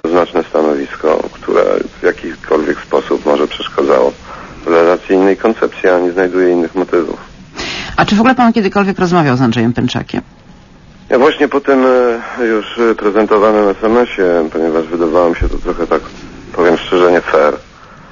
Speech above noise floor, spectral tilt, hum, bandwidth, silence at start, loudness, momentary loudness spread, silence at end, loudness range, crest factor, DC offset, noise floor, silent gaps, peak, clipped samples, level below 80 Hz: 28 dB; -6.5 dB/octave; none; 7.4 kHz; 0.05 s; -12 LUFS; 9 LU; 0.1 s; 2 LU; 12 dB; under 0.1%; -39 dBFS; none; 0 dBFS; under 0.1%; -32 dBFS